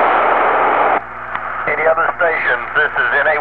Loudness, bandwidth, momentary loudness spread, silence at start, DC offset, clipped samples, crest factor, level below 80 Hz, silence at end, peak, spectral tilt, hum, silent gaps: -15 LUFS; 4.9 kHz; 7 LU; 0 s; 1%; under 0.1%; 14 dB; -48 dBFS; 0 s; -2 dBFS; -6.5 dB/octave; 60 Hz at -45 dBFS; none